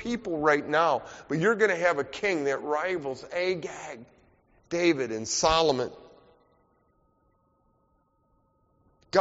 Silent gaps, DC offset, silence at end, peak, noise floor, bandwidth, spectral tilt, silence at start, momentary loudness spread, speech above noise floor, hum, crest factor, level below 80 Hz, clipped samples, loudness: none; under 0.1%; 0 s; -6 dBFS; -69 dBFS; 8 kHz; -3 dB/octave; 0 s; 11 LU; 42 dB; none; 22 dB; -56 dBFS; under 0.1%; -27 LUFS